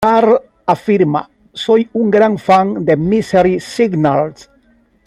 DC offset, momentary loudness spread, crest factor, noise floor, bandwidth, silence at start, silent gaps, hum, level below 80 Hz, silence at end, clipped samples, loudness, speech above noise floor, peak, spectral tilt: under 0.1%; 6 LU; 12 dB; -53 dBFS; 12.5 kHz; 0 s; none; none; -48 dBFS; 0.75 s; under 0.1%; -14 LUFS; 40 dB; 0 dBFS; -7 dB/octave